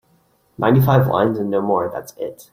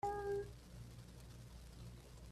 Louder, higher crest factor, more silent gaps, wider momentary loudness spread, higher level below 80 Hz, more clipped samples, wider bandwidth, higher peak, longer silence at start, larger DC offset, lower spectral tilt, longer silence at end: first, -18 LUFS vs -50 LUFS; about the same, 16 dB vs 16 dB; neither; about the same, 15 LU vs 14 LU; first, -52 dBFS vs -60 dBFS; neither; first, 16 kHz vs 14.5 kHz; first, -2 dBFS vs -32 dBFS; first, 0.6 s vs 0.05 s; neither; first, -8 dB/octave vs -6 dB/octave; about the same, 0.1 s vs 0 s